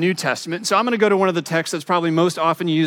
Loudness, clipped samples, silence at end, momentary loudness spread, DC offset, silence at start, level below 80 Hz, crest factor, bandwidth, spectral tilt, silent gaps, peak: -19 LUFS; under 0.1%; 0 s; 6 LU; under 0.1%; 0 s; -74 dBFS; 16 dB; 17 kHz; -5 dB/octave; none; -4 dBFS